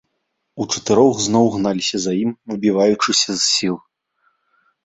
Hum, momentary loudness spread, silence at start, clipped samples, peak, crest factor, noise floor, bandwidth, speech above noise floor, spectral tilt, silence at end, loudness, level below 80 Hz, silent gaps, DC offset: none; 9 LU; 0.55 s; under 0.1%; -2 dBFS; 18 dB; -73 dBFS; 8.4 kHz; 56 dB; -3.5 dB/octave; 1.05 s; -17 LUFS; -56 dBFS; none; under 0.1%